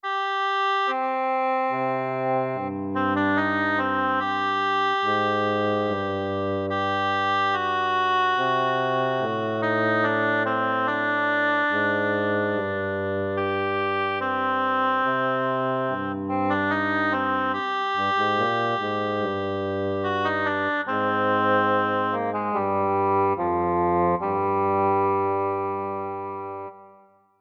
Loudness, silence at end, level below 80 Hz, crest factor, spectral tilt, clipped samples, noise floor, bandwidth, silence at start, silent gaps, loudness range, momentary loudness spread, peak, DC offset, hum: -24 LUFS; 0.5 s; -64 dBFS; 12 dB; -6.5 dB/octave; under 0.1%; -55 dBFS; 7.2 kHz; 0.05 s; none; 2 LU; 5 LU; -12 dBFS; under 0.1%; none